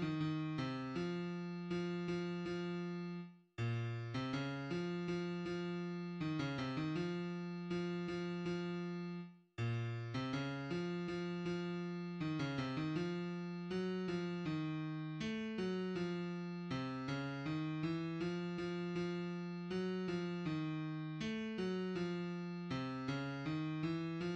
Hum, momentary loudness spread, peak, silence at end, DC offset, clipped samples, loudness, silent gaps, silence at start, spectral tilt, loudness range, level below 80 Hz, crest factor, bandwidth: none; 4 LU; -28 dBFS; 0 s; under 0.1%; under 0.1%; -42 LUFS; none; 0 s; -7 dB/octave; 1 LU; -70 dBFS; 14 dB; 8.4 kHz